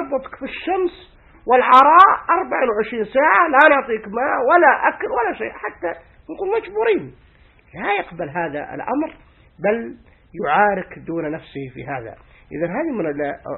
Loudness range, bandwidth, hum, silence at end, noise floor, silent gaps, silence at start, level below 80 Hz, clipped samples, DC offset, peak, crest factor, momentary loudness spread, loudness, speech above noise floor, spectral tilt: 10 LU; 7.4 kHz; none; 0 s; -51 dBFS; none; 0 s; -52 dBFS; under 0.1%; under 0.1%; 0 dBFS; 18 dB; 18 LU; -18 LUFS; 33 dB; -7 dB/octave